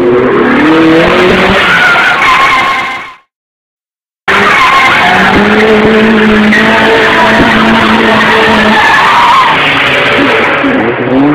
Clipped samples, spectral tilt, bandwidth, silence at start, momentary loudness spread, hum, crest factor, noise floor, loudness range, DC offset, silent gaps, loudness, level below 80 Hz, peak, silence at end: 2%; -4.5 dB/octave; 16 kHz; 0 s; 4 LU; none; 6 dB; under -90 dBFS; 3 LU; under 0.1%; 3.35-3.78 s; -5 LUFS; -32 dBFS; 0 dBFS; 0 s